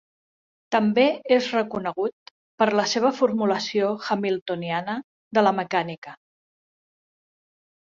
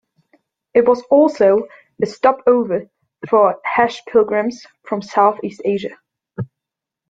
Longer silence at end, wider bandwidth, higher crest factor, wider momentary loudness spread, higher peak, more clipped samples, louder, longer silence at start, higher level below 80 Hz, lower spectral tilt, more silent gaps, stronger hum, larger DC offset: first, 1.7 s vs 0.65 s; about the same, 7.6 kHz vs 7.8 kHz; about the same, 20 dB vs 16 dB; second, 9 LU vs 17 LU; second, -6 dBFS vs -2 dBFS; neither; second, -23 LUFS vs -16 LUFS; about the same, 0.7 s vs 0.75 s; second, -70 dBFS vs -60 dBFS; second, -5 dB/octave vs -6.5 dB/octave; first, 2.13-2.58 s, 4.41-4.46 s, 5.04-5.31 s, 5.98-6.02 s vs none; neither; neither